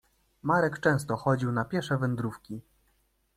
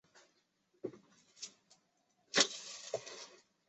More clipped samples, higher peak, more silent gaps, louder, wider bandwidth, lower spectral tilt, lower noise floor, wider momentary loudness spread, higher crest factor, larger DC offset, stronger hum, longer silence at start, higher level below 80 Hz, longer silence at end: neither; about the same, -12 dBFS vs -12 dBFS; neither; first, -28 LUFS vs -36 LUFS; first, 14.5 kHz vs 8.2 kHz; first, -7 dB/octave vs -0.5 dB/octave; second, -71 dBFS vs -77 dBFS; second, 14 LU vs 19 LU; second, 18 dB vs 30 dB; neither; neither; first, 0.45 s vs 0.15 s; first, -60 dBFS vs -86 dBFS; first, 0.75 s vs 0.3 s